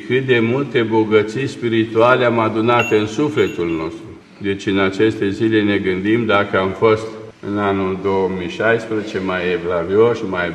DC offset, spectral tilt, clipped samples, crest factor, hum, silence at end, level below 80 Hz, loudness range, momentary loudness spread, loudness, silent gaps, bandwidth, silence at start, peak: under 0.1%; -6.5 dB/octave; under 0.1%; 16 dB; none; 0 s; -54 dBFS; 3 LU; 8 LU; -17 LUFS; none; 9.8 kHz; 0 s; 0 dBFS